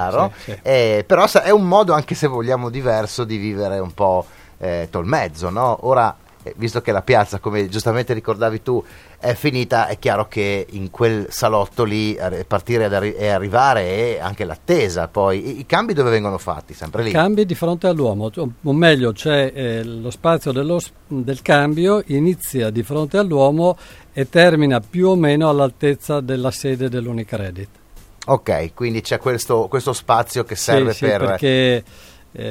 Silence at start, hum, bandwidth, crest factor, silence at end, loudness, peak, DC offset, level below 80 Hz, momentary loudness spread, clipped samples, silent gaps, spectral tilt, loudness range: 0 s; none; 16.5 kHz; 18 dB; 0 s; -18 LUFS; 0 dBFS; under 0.1%; -46 dBFS; 10 LU; under 0.1%; none; -5.5 dB/octave; 4 LU